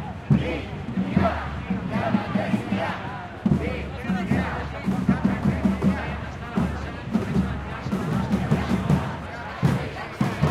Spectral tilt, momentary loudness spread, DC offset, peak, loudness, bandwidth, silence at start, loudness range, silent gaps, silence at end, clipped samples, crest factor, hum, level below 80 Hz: -7.5 dB/octave; 8 LU; under 0.1%; -6 dBFS; -25 LUFS; 12.5 kHz; 0 s; 1 LU; none; 0 s; under 0.1%; 18 dB; none; -40 dBFS